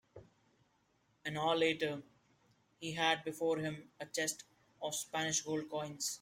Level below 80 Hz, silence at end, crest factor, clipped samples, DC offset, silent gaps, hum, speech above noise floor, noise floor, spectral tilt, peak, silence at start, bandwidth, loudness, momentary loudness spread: -78 dBFS; 0.05 s; 22 dB; under 0.1%; under 0.1%; none; none; 38 dB; -76 dBFS; -2.5 dB/octave; -18 dBFS; 0.15 s; 16.5 kHz; -37 LUFS; 13 LU